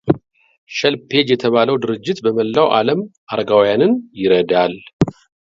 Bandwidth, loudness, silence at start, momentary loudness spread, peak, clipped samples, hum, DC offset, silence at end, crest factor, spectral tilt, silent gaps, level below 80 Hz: 7.6 kHz; -16 LUFS; 0.05 s; 7 LU; 0 dBFS; under 0.1%; none; under 0.1%; 0.3 s; 16 dB; -6 dB/octave; 0.58-0.67 s, 3.18-3.27 s, 4.93-5.00 s; -50 dBFS